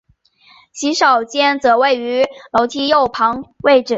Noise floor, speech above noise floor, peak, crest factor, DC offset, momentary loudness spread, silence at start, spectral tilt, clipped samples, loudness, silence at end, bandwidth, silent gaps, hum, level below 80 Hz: -52 dBFS; 37 dB; -2 dBFS; 14 dB; under 0.1%; 6 LU; 0.75 s; -2.5 dB/octave; under 0.1%; -15 LUFS; 0 s; 8 kHz; none; none; -54 dBFS